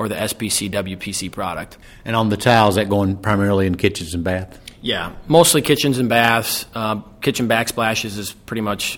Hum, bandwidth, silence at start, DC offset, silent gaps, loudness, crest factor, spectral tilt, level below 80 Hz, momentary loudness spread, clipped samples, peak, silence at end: none; 19 kHz; 0 s; under 0.1%; none; -18 LUFS; 18 dB; -4 dB/octave; -44 dBFS; 13 LU; under 0.1%; 0 dBFS; 0 s